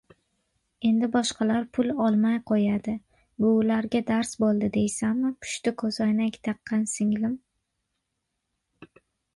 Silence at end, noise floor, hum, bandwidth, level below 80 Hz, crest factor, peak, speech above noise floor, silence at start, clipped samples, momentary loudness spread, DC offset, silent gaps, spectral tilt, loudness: 0.5 s; -80 dBFS; none; 11.5 kHz; -62 dBFS; 16 dB; -12 dBFS; 56 dB; 0.8 s; under 0.1%; 6 LU; under 0.1%; none; -5.5 dB/octave; -26 LUFS